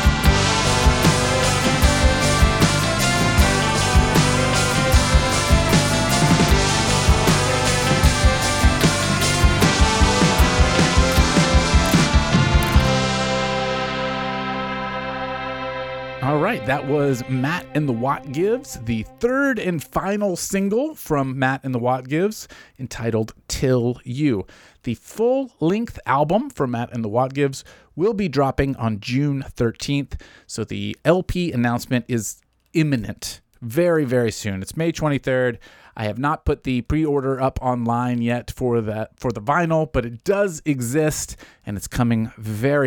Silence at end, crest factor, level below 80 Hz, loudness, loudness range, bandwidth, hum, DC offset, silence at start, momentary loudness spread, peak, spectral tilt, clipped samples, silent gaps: 0 s; 16 dB; -28 dBFS; -20 LUFS; 6 LU; 19 kHz; none; under 0.1%; 0 s; 11 LU; -4 dBFS; -4.5 dB/octave; under 0.1%; none